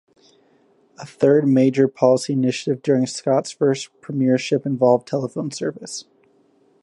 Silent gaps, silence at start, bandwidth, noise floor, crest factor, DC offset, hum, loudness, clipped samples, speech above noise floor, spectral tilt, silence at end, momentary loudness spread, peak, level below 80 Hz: none; 1 s; 11.5 kHz; -58 dBFS; 18 dB; under 0.1%; none; -19 LUFS; under 0.1%; 39 dB; -6 dB/octave; 0.8 s; 12 LU; -2 dBFS; -70 dBFS